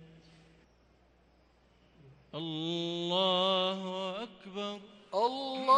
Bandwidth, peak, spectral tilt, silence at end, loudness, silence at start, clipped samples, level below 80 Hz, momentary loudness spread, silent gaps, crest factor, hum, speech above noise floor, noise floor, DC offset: 10.5 kHz; -14 dBFS; -5 dB/octave; 0 s; -33 LUFS; 0 s; under 0.1%; -72 dBFS; 14 LU; none; 20 dB; none; 35 dB; -66 dBFS; under 0.1%